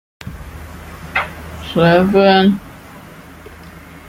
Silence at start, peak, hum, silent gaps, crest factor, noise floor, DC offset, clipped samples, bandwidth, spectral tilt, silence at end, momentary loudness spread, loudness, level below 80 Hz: 0.25 s; 0 dBFS; none; none; 16 dB; -37 dBFS; under 0.1%; under 0.1%; 16 kHz; -7 dB/octave; 0.1 s; 26 LU; -14 LUFS; -40 dBFS